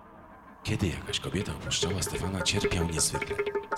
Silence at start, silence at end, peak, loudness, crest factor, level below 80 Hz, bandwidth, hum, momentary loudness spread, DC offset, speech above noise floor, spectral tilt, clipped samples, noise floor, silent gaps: 0 s; 0 s; -12 dBFS; -30 LUFS; 18 dB; -46 dBFS; 16.5 kHz; none; 6 LU; under 0.1%; 20 dB; -3.5 dB/octave; under 0.1%; -50 dBFS; none